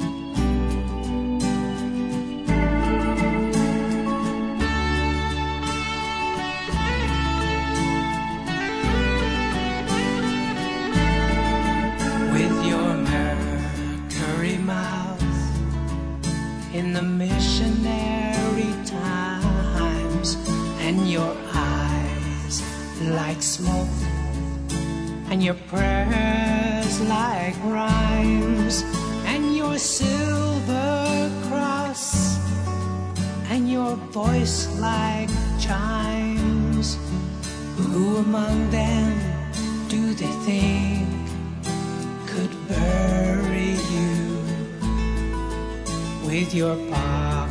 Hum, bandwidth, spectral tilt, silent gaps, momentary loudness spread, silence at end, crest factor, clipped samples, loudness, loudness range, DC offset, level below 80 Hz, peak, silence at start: none; 11 kHz; -5 dB/octave; none; 6 LU; 0 s; 16 dB; under 0.1%; -24 LUFS; 3 LU; under 0.1%; -30 dBFS; -8 dBFS; 0 s